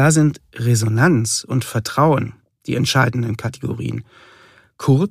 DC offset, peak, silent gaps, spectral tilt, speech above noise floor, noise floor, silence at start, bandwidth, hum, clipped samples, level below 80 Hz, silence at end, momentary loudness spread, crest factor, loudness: under 0.1%; 0 dBFS; none; -5.5 dB/octave; 32 dB; -49 dBFS; 0 s; 15.5 kHz; none; under 0.1%; -52 dBFS; 0 s; 11 LU; 18 dB; -18 LUFS